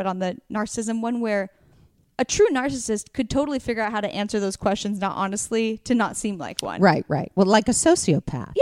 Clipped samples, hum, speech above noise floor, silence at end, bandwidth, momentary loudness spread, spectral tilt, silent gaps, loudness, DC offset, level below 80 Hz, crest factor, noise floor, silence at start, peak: under 0.1%; none; 34 dB; 0 s; 15.5 kHz; 10 LU; -4.5 dB/octave; none; -23 LUFS; under 0.1%; -50 dBFS; 22 dB; -57 dBFS; 0 s; -2 dBFS